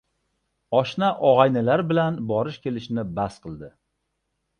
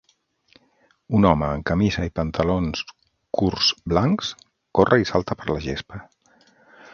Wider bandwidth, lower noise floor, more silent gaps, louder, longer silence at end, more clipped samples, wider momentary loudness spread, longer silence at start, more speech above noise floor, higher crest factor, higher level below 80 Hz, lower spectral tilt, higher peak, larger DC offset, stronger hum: first, 9.6 kHz vs 7.2 kHz; first, -76 dBFS vs -63 dBFS; neither; about the same, -22 LUFS vs -22 LUFS; about the same, 0.9 s vs 0.9 s; neither; about the same, 13 LU vs 13 LU; second, 0.7 s vs 1.1 s; first, 54 dB vs 41 dB; about the same, 22 dB vs 22 dB; second, -56 dBFS vs -40 dBFS; first, -7.5 dB/octave vs -6 dB/octave; about the same, -2 dBFS vs 0 dBFS; neither; neither